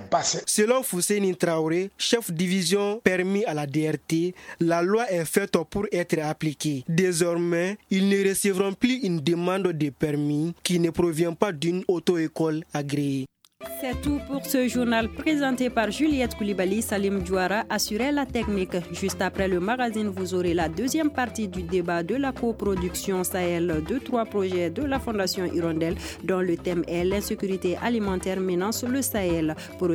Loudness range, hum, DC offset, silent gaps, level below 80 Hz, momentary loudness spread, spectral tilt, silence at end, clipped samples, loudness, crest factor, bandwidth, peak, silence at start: 3 LU; none; under 0.1%; none; -46 dBFS; 5 LU; -5 dB/octave; 0 s; under 0.1%; -25 LUFS; 22 dB; 19.5 kHz; -4 dBFS; 0 s